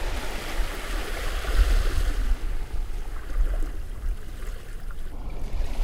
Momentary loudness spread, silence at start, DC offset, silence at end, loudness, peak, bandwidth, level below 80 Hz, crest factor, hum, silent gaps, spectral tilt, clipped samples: 13 LU; 0 s; under 0.1%; 0 s; -32 LUFS; -8 dBFS; 15.5 kHz; -26 dBFS; 18 dB; none; none; -4.5 dB/octave; under 0.1%